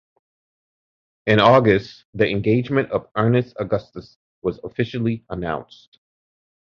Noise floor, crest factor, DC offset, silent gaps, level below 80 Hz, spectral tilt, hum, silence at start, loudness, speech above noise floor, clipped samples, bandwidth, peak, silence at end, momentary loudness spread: under -90 dBFS; 20 dB; under 0.1%; 2.05-2.13 s, 4.16-4.42 s; -50 dBFS; -8 dB/octave; none; 1.25 s; -20 LUFS; over 70 dB; under 0.1%; 7 kHz; 0 dBFS; 1 s; 14 LU